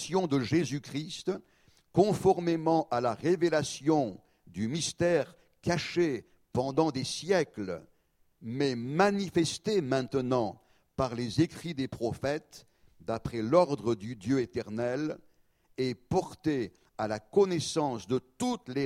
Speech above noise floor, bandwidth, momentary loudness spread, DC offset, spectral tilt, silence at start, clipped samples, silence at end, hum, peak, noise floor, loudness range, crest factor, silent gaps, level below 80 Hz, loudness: 40 dB; 14.5 kHz; 11 LU; under 0.1%; -5.5 dB/octave; 0 s; under 0.1%; 0 s; none; -10 dBFS; -69 dBFS; 4 LU; 22 dB; none; -60 dBFS; -31 LUFS